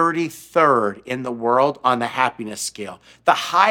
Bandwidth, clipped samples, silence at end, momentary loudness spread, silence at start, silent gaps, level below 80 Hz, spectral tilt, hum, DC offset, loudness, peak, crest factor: 18 kHz; under 0.1%; 0 s; 11 LU; 0 s; none; -66 dBFS; -4 dB/octave; none; under 0.1%; -20 LUFS; 0 dBFS; 20 dB